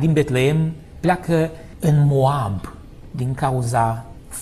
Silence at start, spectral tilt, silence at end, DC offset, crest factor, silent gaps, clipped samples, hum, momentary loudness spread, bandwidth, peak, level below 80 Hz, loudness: 0 s; -7 dB/octave; 0 s; under 0.1%; 16 dB; none; under 0.1%; none; 14 LU; 13.5 kHz; -4 dBFS; -40 dBFS; -20 LUFS